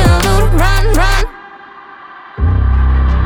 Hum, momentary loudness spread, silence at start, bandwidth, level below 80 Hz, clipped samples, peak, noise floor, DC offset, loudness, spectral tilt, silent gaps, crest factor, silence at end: none; 22 LU; 0 s; 19 kHz; -12 dBFS; under 0.1%; 0 dBFS; -34 dBFS; under 0.1%; -13 LUFS; -5.5 dB/octave; none; 10 dB; 0 s